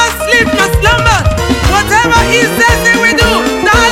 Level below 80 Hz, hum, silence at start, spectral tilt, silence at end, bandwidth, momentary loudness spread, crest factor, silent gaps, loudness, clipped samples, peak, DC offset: -20 dBFS; none; 0 s; -3.5 dB/octave; 0 s; 17 kHz; 3 LU; 8 dB; none; -8 LUFS; 0.2%; 0 dBFS; under 0.1%